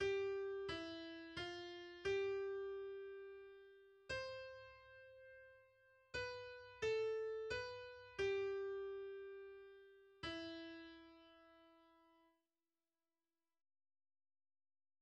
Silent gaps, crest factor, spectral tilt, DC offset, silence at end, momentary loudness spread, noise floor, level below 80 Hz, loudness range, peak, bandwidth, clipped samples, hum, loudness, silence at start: none; 18 dB; -4.5 dB/octave; under 0.1%; 3.05 s; 21 LU; under -90 dBFS; -74 dBFS; 11 LU; -32 dBFS; 9 kHz; under 0.1%; none; -47 LUFS; 0 s